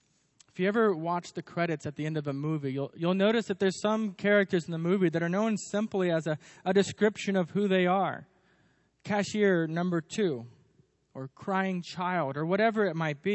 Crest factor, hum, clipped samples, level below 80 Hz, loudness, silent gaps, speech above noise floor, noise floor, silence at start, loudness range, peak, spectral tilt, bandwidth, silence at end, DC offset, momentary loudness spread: 18 dB; none; under 0.1%; -74 dBFS; -29 LUFS; none; 39 dB; -68 dBFS; 0.55 s; 3 LU; -12 dBFS; -6 dB/octave; 8.4 kHz; 0 s; under 0.1%; 9 LU